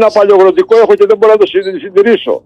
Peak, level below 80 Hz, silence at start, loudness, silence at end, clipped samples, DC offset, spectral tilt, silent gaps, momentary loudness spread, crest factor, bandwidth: 0 dBFS; -56 dBFS; 0 s; -8 LUFS; 0.05 s; 0.2%; under 0.1%; -5.5 dB/octave; none; 5 LU; 8 dB; 8.2 kHz